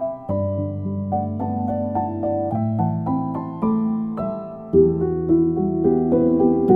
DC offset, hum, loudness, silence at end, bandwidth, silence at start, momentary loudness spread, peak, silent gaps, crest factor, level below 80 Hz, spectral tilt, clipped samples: under 0.1%; none; -21 LUFS; 0 s; 3.2 kHz; 0 s; 8 LU; -4 dBFS; none; 18 dB; -46 dBFS; -13 dB/octave; under 0.1%